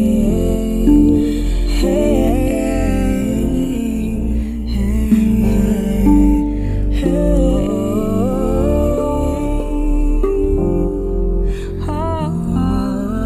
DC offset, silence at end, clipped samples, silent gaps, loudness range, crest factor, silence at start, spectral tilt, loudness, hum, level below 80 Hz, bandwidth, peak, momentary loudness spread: under 0.1%; 0 s; under 0.1%; none; 3 LU; 14 dB; 0 s; -8 dB/octave; -17 LUFS; none; -20 dBFS; 13.5 kHz; 0 dBFS; 7 LU